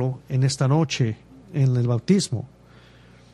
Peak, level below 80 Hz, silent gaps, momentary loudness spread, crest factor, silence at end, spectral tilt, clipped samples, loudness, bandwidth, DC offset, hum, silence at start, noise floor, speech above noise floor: -6 dBFS; -56 dBFS; none; 11 LU; 16 dB; 0.85 s; -6 dB/octave; under 0.1%; -23 LUFS; 11 kHz; under 0.1%; 60 Hz at -35 dBFS; 0 s; -50 dBFS; 29 dB